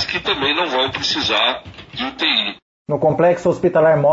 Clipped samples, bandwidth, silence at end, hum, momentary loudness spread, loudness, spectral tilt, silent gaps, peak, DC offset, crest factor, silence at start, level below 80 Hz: under 0.1%; 8 kHz; 0 s; none; 11 LU; -17 LUFS; -4.5 dB/octave; 2.62-2.85 s; -4 dBFS; under 0.1%; 14 dB; 0 s; -50 dBFS